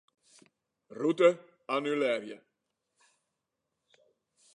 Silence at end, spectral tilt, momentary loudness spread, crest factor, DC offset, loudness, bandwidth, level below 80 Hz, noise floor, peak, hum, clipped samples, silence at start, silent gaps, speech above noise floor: 2.2 s; -5.5 dB/octave; 23 LU; 22 dB; under 0.1%; -29 LUFS; 10 kHz; under -90 dBFS; -85 dBFS; -12 dBFS; none; under 0.1%; 0.9 s; none; 57 dB